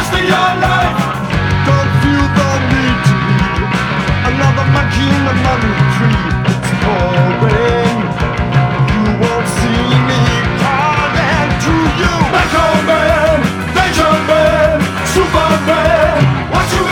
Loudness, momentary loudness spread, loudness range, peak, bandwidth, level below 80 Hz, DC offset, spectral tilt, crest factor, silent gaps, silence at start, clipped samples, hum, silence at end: -12 LUFS; 4 LU; 2 LU; 0 dBFS; 17.5 kHz; -24 dBFS; under 0.1%; -6 dB/octave; 12 dB; none; 0 s; under 0.1%; none; 0 s